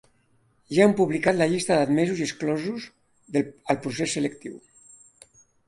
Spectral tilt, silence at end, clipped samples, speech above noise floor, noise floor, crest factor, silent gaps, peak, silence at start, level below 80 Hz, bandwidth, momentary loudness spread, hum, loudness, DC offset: -5 dB/octave; 1.1 s; under 0.1%; 41 dB; -64 dBFS; 20 dB; none; -4 dBFS; 0.7 s; -64 dBFS; 11.5 kHz; 13 LU; none; -24 LUFS; under 0.1%